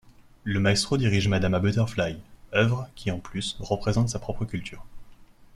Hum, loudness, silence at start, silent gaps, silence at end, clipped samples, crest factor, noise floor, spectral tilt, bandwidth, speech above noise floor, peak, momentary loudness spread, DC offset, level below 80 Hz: none; -26 LUFS; 0.05 s; none; 0.3 s; under 0.1%; 18 dB; -49 dBFS; -5.5 dB/octave; 12.5 kHz; 24 dB; -8 dBFS; 10 LU; under 0.1%; -46 dBFS